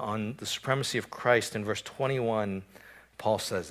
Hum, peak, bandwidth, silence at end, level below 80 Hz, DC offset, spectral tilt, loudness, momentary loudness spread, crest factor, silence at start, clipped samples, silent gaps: none; -10 dBFS; 16 kHz; 0 s; -62 dBFS; under 0.1%; -4.5 dB/octave; -30 LUFS; 8 LU; 22 dB; 0 s; under 0.1%; none